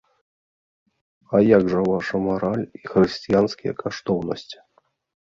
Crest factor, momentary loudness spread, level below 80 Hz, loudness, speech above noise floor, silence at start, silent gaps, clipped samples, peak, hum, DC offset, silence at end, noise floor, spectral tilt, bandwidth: 20 dB; 13 LU; -54 dBFS; -21 LUFS; 44 dB; 1.3 s; none; under 0.1%; -2 dBFS; none; under 0.1%; 0.65 s; -65 dBFS; -7 dB/octave; 7.6 kHz